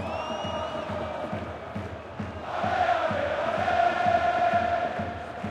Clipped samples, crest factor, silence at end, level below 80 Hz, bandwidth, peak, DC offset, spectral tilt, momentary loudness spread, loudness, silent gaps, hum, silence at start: under 0.1%; 16 dB; 0 s; -54 dBFS; 9.6 kHz; -12 dBFS; under 0.1%; -5.5 dB/octave; 12 LU; -28 LUFS; none; none; 0 s